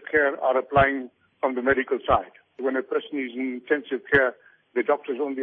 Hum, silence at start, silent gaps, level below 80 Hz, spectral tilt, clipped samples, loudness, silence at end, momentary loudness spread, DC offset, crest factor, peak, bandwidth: none; 0.05 s; none; -50 dBFS; -8.5 dB/octave; under 0.1%; -24 LUFS; 0 s; 10 LU; under 0.1%; 18 dB; -6 dBFS; 4.4 kHz